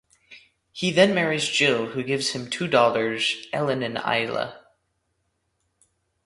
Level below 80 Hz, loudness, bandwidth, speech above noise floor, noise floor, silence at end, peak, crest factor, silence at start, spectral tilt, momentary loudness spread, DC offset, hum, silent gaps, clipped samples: -66 dBFS; -23 LUFS; 11.5 kHz; 51 dB; -74 dBFS; 1.7 s; -4 dBFS; 22 dB; 0.3 s; -4 dB/octave; 9 LU; under 0.1%; none; none; under 0.1%